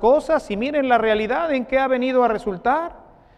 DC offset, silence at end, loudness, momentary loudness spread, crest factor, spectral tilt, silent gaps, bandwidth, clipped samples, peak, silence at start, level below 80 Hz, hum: under 0.1%; 0.4 s; -20 LUFS; 5 LU; 16 dB; -6 dB/octave; none; 11 kHz; under 0.1%; -4 dBFS; 0 s; -48 dBFS; none